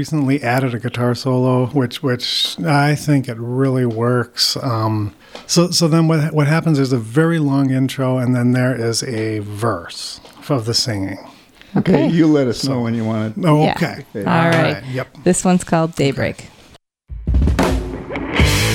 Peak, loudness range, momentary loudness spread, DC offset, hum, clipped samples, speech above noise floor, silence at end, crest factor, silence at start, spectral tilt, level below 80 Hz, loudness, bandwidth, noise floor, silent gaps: -2 dBFS; 3 LU; 10 LU; under 0.1%; none; under 0.1%; 31 dB; 0 s; 16 dB; 0 s; -5.5 dB/octave; -30 dBFS; -17 LUFS; 16.5 kHz; -48 dBFS; none